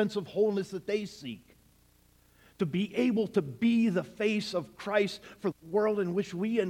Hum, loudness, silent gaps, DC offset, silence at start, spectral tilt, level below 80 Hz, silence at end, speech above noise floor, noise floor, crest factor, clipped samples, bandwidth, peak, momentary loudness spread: 60 Hz at -60 dBFS; -31 LUFS; none; under 0.1%; 0 s; -6.5 dB/octave; -68 dBFS; 0 s; 34 dB; -64 dBFS; 18 dB; under 0.1%; 14.5 kHz; -14 dBFS; 9 LU